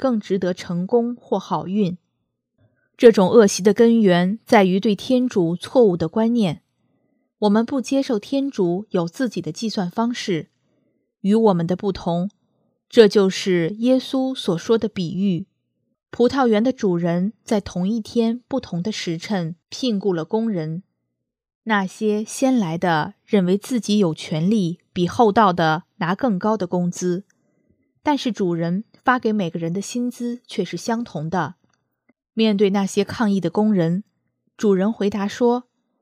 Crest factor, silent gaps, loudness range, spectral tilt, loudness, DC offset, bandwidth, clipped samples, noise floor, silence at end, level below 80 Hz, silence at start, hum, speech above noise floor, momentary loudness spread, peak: 20 dB; 21.55-21.61 s; 7 LU; -6 dB/octave; -20 LUFS; under 0.1%; 14 kHz; under 0.1%; -78 dBFS; 0.4 s; -60 dBFS; 0 s; none; 59 dB; 11 LU; 0 dBFS